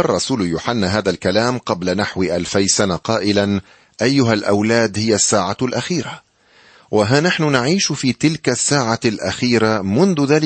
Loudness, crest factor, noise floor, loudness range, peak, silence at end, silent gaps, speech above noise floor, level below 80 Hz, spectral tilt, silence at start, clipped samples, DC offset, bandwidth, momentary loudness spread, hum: -17 LUFS; 16 dB; -51 dBFS; 2 LU; -2 dBFS; 0 s; none; 34 dB; -50 dBFS; -4 dB/octave; 0 s; under 0.1%; under 0.1%; 8.8 kHz; 6 LU; none